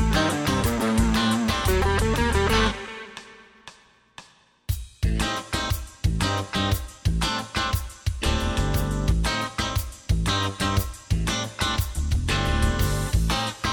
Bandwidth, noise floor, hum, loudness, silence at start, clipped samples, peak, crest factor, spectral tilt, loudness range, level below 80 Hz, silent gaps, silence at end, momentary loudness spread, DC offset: 19.5 kHz; -53 dBFS; none; -25 LUFS; 0 s; under 0.1%; -8 dBFS; 16 dB; -4.5 dB/octave; 5 LU; -30 dBFS; none; 0 s; 7 LU; under 0.1%